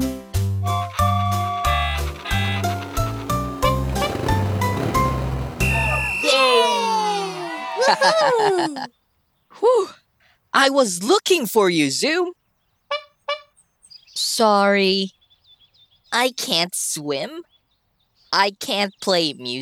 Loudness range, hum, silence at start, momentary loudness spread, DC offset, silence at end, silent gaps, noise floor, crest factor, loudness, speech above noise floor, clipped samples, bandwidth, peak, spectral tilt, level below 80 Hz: 4 LU; none; 0 s; 12 LU; under 0.1%; 0 s; none; -67 dBFS; 20 dB; -20 LUFS; 48 dB; under 0.1%; 19.5 kHz; -2 dBFS; -4 dB/octave; -36 dBFS